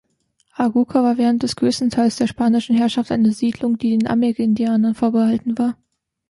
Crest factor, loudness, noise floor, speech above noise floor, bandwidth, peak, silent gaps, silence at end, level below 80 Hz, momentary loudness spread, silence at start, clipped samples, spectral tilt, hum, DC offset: 14 dB; -18 LUFS; -65 dBFS; 48 dB; 11.5 kHz; -4 dBFS; none; 0.55 s; -54 dBFS; 4 LU; 0.6 s; under 0.1%; -6 dB/octave; none; under 0.1%